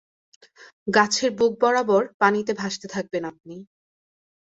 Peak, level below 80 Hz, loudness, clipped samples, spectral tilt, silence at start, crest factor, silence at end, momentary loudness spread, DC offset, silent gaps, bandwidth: -2 dBFS; -66 dBFS; -22 LUFS; under 0.1%; -3.5 dB/octave; 0.6 s; 22 dB; 0.75 s; 16 LU; under 0.1%; 0.73-0.86 s, 2.14-2.19 s; 8 kHz